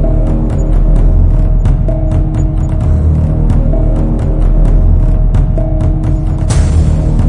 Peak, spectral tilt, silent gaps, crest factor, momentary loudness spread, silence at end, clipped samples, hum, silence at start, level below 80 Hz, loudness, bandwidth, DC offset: 0 dBFS; -8.5 dB/octave; none; 8 dB; 3 LU; 0 s; under 0.1%; none; 0 s; -10 dBFS; -12 LUFS; 10 kHz; under 0.1%